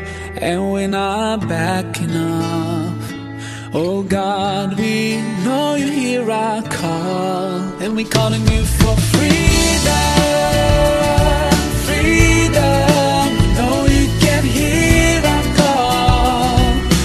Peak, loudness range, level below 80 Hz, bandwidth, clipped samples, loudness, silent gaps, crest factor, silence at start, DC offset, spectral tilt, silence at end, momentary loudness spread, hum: 0 dBFS; 6 LU; -22 dBFS; 13 kHz; under 0.1%; -15 LUFS; none; 14 dB; 0 s; under 0.1%; -5 dB/octave; 0 s; 8 LU; none